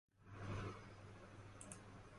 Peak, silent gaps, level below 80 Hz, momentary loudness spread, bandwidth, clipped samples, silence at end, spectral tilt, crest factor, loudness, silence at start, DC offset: -34 dBFS; none; -66 dBFS; 10 LU; 11.5 kHz; under 0.1%; 0 s; -5 dB/octave; 20 dB; -54 LUFS; 0.15 s; under 0.1%